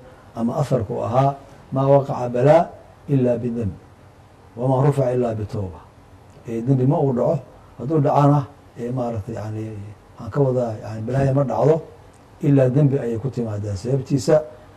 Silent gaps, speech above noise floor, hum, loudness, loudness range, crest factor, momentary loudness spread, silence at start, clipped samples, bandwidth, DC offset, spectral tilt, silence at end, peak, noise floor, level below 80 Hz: none; 28 dB; none; -20 LUFS; 3 LU; 18 dB; 14 LU; 0 s; under 0.1%; 9.8 kHz; under 0.1%; -8.5 dB/octave; 0.2 s; -2 dBFS; -47 dBFS; -52 dBFS